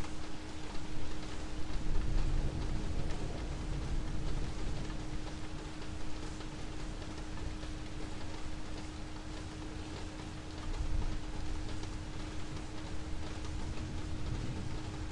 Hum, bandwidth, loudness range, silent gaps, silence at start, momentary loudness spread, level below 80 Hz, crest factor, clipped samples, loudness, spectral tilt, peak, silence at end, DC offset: none; 11 kHz; 4 LU; none; 0 s; 5 LU; -40 dBFS; 16 dB; under 0.1%; -43 LUFS; -5.5 dB/octave; -18 dBFS; 0 s; under 0.1%